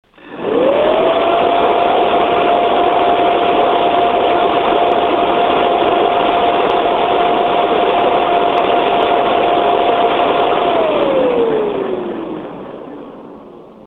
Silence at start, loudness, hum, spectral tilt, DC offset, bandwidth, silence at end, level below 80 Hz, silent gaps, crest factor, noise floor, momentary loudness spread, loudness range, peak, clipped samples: 0.25 s; -13 LUFS; none; -6.5 dB/octave; under 0.1%; 4.4 kHz; 0.15 s; -46 dBFS; none; 14 dB; -36 dBFS; 9 LU; 2 LU; 0 dBFS; under 0.1%